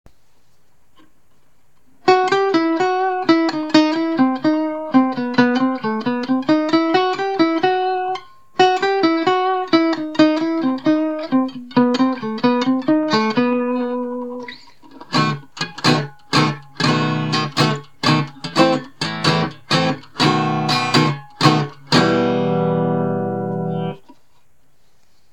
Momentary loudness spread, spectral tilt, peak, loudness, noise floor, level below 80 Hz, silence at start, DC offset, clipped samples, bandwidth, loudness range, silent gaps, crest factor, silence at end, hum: 7 LU; -5.5 dB/octave; 0 dBFS; -18 LUFS; -61 dBFS; -62 dBFS; 2.05 s; 0.6%; under 0.1%; 12 kHz; 3 LU; none; 18 dB; 1.35 s; none